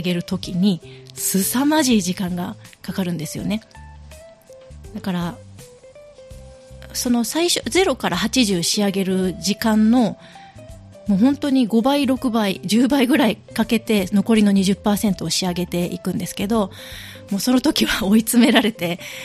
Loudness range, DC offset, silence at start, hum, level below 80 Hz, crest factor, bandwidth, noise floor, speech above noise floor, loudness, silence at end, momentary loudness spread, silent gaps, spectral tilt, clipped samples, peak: 10 LU; under 0.1%; 0 s; none; -46 dBFS; 18 dB; 15.5 kHz; -44 dBFS; 25 dB; -19 LUFS; 0 s; 12 LU; none; -4.5 dB/octave; under 0.1%; 0 dBFS